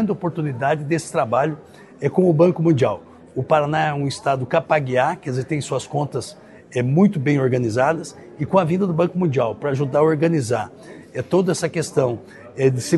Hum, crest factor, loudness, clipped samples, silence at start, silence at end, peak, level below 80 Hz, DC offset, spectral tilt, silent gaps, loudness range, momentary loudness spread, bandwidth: none; 18 dB; -20 LUFS; under 0.1%; 0 s; 0 s; -2 dBFS; -60 dBFS; under 0.1%; -6.5 dB/octave; none; 2 LU; 12 LU; 12 kHz